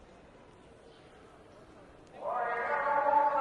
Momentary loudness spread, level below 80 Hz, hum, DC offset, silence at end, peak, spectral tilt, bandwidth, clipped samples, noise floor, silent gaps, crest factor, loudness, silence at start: 14 LU; -68 dBFS; none; under 0.1%; 0 s; -16 dBFS; -5.5 dB/octave; 9.8 kHz; under 0.1%; -56 dBFS; none; 18 dB; -31 LUFS; 1.25 s